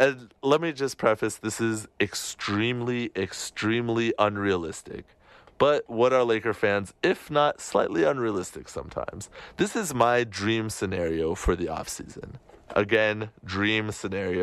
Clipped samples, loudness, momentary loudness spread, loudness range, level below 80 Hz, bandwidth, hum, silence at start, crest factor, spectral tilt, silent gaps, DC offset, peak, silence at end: under 0.1%; -26 LUFS; 13 LU; 3 LU; -46 dBFS; 13 kHz; none; 0 s; 20 dB; -4.5 dB/octave; none; under 0.1%; -8 dBFS; 0 s